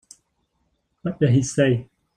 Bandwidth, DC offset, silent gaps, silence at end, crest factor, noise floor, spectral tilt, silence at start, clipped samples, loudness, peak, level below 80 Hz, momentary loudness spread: 10.5 kHz; under 0.1%; none; 0.3 s; 18 dB; -71 dBFS; -6.5 dB/octave; 1.05 s; under 0.1%; -21 LUFS; -6 dBFS; -54 dBFS; 12 LU